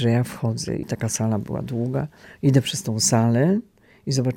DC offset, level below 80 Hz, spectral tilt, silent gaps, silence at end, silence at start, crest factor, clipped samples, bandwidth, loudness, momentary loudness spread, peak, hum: under 0.1%; -54 dBFS; -5.5 dB/octave; none; 0 s; 0 s; 16 dB; under 0.1%; 17 kHz; -22 LUFS; 9 LU; -6 dBFS; none